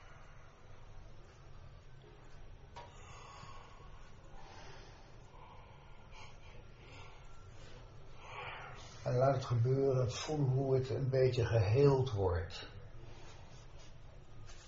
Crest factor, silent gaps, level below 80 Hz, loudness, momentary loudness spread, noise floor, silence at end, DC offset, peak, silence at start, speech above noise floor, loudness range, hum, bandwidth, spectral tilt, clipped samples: 22 dB; none; -56 dBFS; -34 LUFS; 26 LU; -55 dBFS; 0 s; under 0.1%; -16 dBFS; 0 s; 22 dB; 23 LU; none; 7.6 kHz; -7 dB/octave; under 0.1%